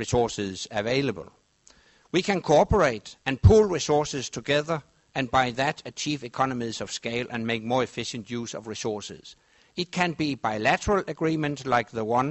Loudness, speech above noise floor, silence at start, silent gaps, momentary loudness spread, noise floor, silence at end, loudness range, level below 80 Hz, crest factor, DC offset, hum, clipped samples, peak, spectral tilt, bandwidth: -26 LUFS; 34 dB; 0 s; none; 12 LU; -59 dBFS; 0 s; 7 LU; -42 dBFS; 20 dB; under 0.1%; none; under 0.1%; -4 dBFS; -5 dB/octave; 8.2 kHz